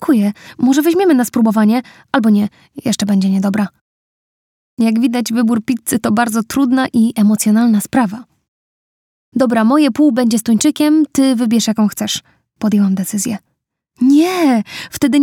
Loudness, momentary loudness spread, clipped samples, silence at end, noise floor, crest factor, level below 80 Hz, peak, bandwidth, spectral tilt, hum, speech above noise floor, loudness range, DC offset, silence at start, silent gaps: -14 LUFS; 8 LU; under 0.1%; 0 s; -66 dBFS; 14 dB; -56 dBFS; 0 dBFS; 17 kHz; -5 dB/octave; none; 53 dB; 3 LU; under 0.1%; 0 s; 3.81-4.77 s, 8.48-9.32 s